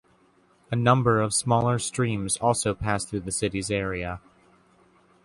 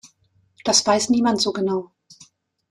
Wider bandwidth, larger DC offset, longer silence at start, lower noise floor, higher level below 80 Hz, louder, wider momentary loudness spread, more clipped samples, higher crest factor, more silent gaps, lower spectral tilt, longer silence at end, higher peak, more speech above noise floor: second, 11.5 kHz vs 13.5 kHz; neither; about the same, 0.7 s vs 0.65 s; about the same, -61 dBFS vs -62 dBFS; first, -48 dBFS vs -64 dBFS; second, -25 LUFS vs -20 LUFS; about the same, 10 LU vs 10 LU; neither; about the same, 20 dB vs 18 dB; neither; first, -4.5 dB/octave vs -3 dB/octave; first, 1.05 s vs 0.85 s; about the same, -6 dBFS vs -4 dBFS; second, 37 dB vs 43 dB